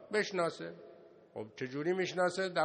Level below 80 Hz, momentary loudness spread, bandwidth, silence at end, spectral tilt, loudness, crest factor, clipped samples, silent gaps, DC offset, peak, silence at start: -82 dBFS; 17 LU; 9.4 kHz; 0 s; -4.5 dB/octave; -35 LUFS; 18 dB; under 0.1%; none; under 0.1%; -18 dBFS; 0 s